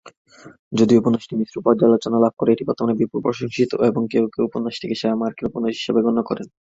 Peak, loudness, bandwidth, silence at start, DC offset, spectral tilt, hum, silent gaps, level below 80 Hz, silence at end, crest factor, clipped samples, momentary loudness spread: -2 dBFS; -20 LUFS; 7.8 kHz; 0.05 s; under 0.1%; -7 dB/octave; none; 0.17-0.25 s, 0.59-0.71 s; -58 dBFS; 0.3 s; 18 dB; under 0.1%; 9 LU